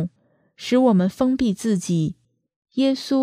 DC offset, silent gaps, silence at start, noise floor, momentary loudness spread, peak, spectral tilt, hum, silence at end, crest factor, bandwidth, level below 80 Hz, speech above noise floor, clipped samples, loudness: under 0.1%; 2.56-2.62 s; 0 s; -63 dBFS; 13 LU; -6 dBFS; -6.5 dB/octave; none; 0 s; 16 dB; 14.5 kHz; -54 dBFS; 43 dB; under 0.1%; -21 LUFS